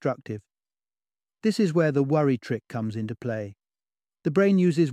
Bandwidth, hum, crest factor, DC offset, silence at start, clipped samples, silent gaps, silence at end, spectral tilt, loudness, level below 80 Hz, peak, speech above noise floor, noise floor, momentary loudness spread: 11.5 kHz; none; 16 dB; under 0.1%; 0.05 s; under 0.1%; none; 0 s; -7.5 dB/octave; -25 LUFS; -70 dBFS; -10 dBFS; over 66 dB; under -90 dBFS; 13 LU